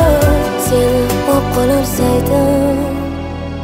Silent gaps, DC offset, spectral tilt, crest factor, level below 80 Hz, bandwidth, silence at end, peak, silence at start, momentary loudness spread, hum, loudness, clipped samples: none; under 0.1%; -6 dB/octave; 12 dB; -24 dBFS; 16.5 kHz; 0 s; 0 dBFS; 0 s; 8 LU; none; -14 LUFS; under 0.1%